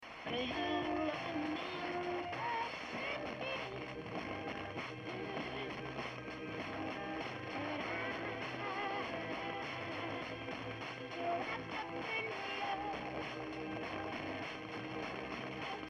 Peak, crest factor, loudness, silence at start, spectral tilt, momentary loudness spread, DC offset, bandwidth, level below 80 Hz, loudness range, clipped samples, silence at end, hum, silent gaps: -26 dBFS; 16 dB; -41 LUFS; 0 s; -5.5 dB/octave; 5 LU; under 0.1%; 11.5 kHz; -68 dBFS; 3 LU; under 0.1%; 0 s; none; none